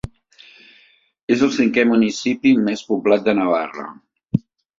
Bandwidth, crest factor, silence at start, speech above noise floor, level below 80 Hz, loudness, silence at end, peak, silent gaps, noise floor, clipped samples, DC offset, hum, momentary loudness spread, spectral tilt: 7.6 kHz; 18 dB; 0.05 s; 37 dB; -52 dBFS; -18 LUFS; 0.4 s; -2 dBFS; 1.23-1.28 s; -55 dBFS; under 0.1%; under 0.1%; none; 16 LU; -6 dB/octave